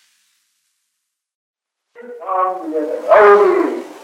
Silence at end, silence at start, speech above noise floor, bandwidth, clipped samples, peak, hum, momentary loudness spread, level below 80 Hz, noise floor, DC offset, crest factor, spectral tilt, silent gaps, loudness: 0.05 s; 2 s; 62 dB; 9.6 kHz; under 0.1%; 0 dBFS; none; 14 LU; -64 dBFS; -75 dBFS; under 0.1%; 16 dB; -5 dB/octave; none; -13 LUFS